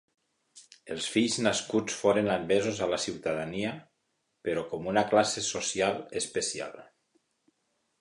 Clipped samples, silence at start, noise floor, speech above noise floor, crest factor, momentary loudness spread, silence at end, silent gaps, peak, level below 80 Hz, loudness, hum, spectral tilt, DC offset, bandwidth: under 0.1%; 0.55 s; -78 dBFS; 49 dB; 22 dB; 10 LU; 1.2 s; none; -10 dBFS; -64 dBFS; -29 LUFS; none; -3.5 dB/octave; under 0.1%; 11.5 kHz